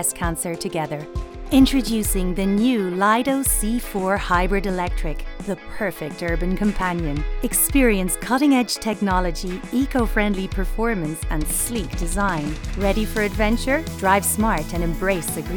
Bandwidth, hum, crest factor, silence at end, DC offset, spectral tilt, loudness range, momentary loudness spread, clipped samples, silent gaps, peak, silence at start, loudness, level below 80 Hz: over 20 kHz; none; 18 dB; 0 s; under 0.1%; -4.5 dB/octave; 4 LU; 9 LU; under 0.1%; none; -2 dBFS; 0 s; -21 LUFS; -28 dBFS